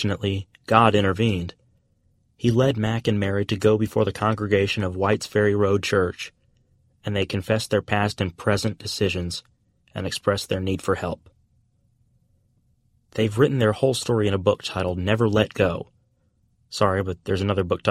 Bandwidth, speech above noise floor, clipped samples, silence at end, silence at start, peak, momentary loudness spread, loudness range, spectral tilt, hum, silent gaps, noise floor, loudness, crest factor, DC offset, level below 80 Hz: 14.5 kHz; 43 dB; under 0.1%; 0 s; 0 s; -2 dBFS; 11 LU; 6 LU; -6 dB/octave; none; none; -65 dBFS; -23 LUFS; 22 dB; under 0.1%; -50 dBFS